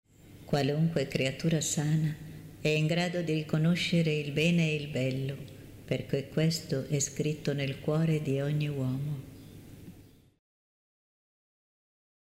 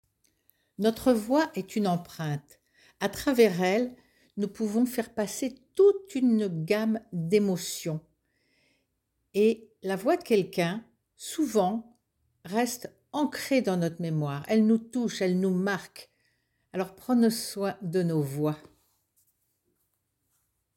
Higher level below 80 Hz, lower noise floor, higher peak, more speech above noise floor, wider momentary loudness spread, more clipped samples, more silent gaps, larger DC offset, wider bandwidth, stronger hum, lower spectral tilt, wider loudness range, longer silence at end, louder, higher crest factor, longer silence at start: first, -60 dBFS vs -66 dBFS; second, -54 dBFS vs -78 dBFS; second, -14 dBFS vs -8 dBFS; second, 25 dB vs 51 dB; first, 16 LU vs 11 LU; neither; neither; neither; about the same, 16 kHz vs 17 kHz; neither; about the same, -5.5 dB/octave vs -6 dB/octave; first, 7 LU vs 3 LU; about the same, 2.2 s vs 2.2 s; about the same, -30 LUFS vs -28 LUFS; about the same, 16 dB vs 20 dB; second, 0.25 s vs 0.8 s